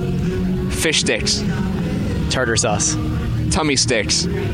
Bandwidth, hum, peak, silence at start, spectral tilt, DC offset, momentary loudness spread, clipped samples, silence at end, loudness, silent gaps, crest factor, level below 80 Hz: 16 kHz; none; -4 dBFS; 0 s; -3.5 dB/octave; under 0.1%; 6 LU; under 0.1%; 0 s; -18 LUFS; none; 14 dB; -30 dBFS